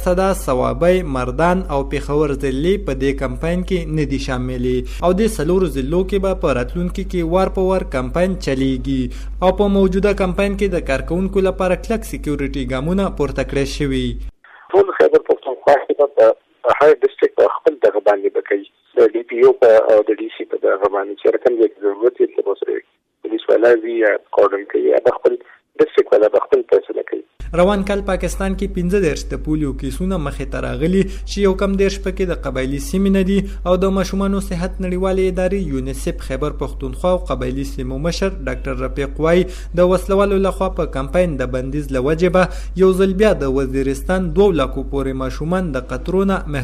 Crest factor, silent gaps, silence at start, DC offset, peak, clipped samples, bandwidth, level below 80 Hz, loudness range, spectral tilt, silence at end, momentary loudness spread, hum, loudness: 14 dB; none; 0 s; under 0.1%; -4 dBFS; under 0.1%; 14.5 kHz; -28 dBFS; 5 LU; -6.5 dB/octave; 0 s; 9 LU; none; -17 LUFS